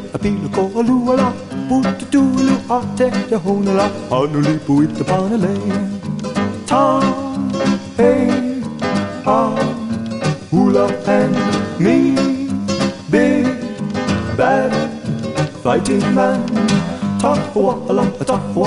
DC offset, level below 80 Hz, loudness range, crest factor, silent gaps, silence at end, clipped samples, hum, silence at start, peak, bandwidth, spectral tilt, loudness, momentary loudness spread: under 0.1%; -42 dBFS; 1 LU; 14 dB; none; 0 s; under 0.1%; none; 0 s; -2 dBFS; 11.5 kHz; -6.5 dB/octave; -17 LUFS; 7 LU